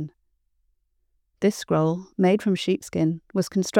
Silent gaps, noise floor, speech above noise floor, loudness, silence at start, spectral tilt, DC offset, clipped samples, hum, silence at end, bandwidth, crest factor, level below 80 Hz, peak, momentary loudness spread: none; -71 dBFS; 48 dB; -24 LUFS; 0 s; -6 dB/octave; under 0.1%; under 0.1%; none; 0 s; 15.5 kHz; 20 dB; -64 dBFS; -4 dBFS; 5 LU